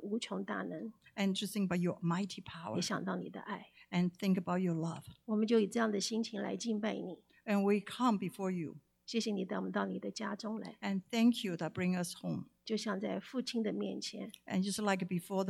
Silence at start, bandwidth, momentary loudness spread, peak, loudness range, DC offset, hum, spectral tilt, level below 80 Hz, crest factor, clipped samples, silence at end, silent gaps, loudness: 0 s; 15 kHz; 12 LU; -20 dBFS; 3 LU; under 0.1%; none; -5.5 dB/octave; -78 dBFS; 18 dB; under 0.1%; 0 s; none; -37 LUFS